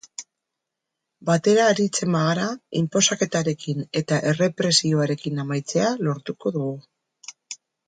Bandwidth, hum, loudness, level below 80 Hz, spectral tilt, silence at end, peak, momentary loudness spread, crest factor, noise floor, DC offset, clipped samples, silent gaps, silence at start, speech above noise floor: 9.6 kHz; none; -22 LUFS; -66 dBFS; -4.5 dB/octave; 0.35 s; -4 dBFS; 20 LU; 20 dB; -83 dBFS; under 0.1%; under 0.1%; none; 0.2 s; 61 dB